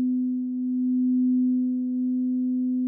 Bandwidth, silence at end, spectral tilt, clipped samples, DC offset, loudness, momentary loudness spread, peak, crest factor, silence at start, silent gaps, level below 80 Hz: 0.8 kHz; 0 s; -15.5 dB/octave; under 0.1%; under 0.1%; -25 LUFS; 5 LU; -18 dBFS; 6 dB; 0 s; none; -86 dBFS